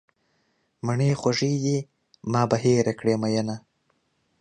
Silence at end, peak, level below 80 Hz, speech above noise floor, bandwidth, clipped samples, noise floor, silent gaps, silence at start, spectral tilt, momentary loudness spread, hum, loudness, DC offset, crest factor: 0.8 s; -6 dBFS; -62 dBFS; 47 dB; 9.6 kHz; under 0.1%; -70 dBFS; none; 0.85 s; -6 dB/octave; 12 LU; none; -24 LUFS; under 0.1%; 20 dB